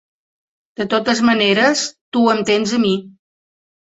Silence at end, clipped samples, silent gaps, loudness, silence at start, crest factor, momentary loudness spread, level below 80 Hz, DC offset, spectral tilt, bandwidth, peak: 0.9 s; under 0.1%; 2.01-2.12 s; -16 LUFS; 0.8 s; 18 dB; 9 LU; -58 dBFS; under 0.1%; -3.5 dB/octave; 8 kHz; -2 dBFS